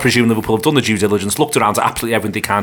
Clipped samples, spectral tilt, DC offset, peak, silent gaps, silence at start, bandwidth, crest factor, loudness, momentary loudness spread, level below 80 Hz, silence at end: under 0.1%; -4.5 dB/octave; under 0.1%; 0 dBFS; none; 0 s; 19 kHz; 14 dB; -15 LUFS; 4 LU; -44 dBFS; 0 s